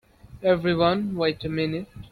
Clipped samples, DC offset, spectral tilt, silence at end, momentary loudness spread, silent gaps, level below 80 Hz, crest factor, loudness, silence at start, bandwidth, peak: under 0.1%; under 0.1%; -8 dB/octave; 0.05 s; 7 LU; none; -50 dBFS; 18 dB; -24 LUFS; 0.3 s; 12 kHz; -8 dBFS